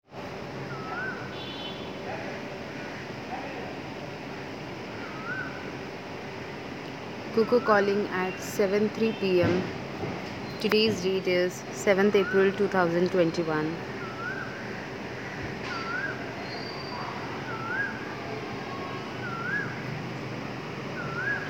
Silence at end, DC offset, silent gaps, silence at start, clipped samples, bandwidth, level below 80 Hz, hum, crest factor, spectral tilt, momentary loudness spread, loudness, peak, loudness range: 0 s; 0.1%; none; 0.1 s; under 0.1%; 17.5 kHz; -60 dBFS; none; 22 dB; -5.5 dB/octave; 14 LU; -30 LUFS; -8 dBFS; 11 LU